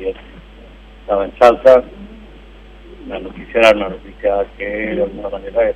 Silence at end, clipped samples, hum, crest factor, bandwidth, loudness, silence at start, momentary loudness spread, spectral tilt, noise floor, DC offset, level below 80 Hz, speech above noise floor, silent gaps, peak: 0 s; 0.3%; none; 16 dB; 11 kHz; -15 LUFS; 0 s; 23 LU; -5 dB/octave; -39 dBFS; under 0.1%; -38 dBFS; 24 dB; none; 0 dBFS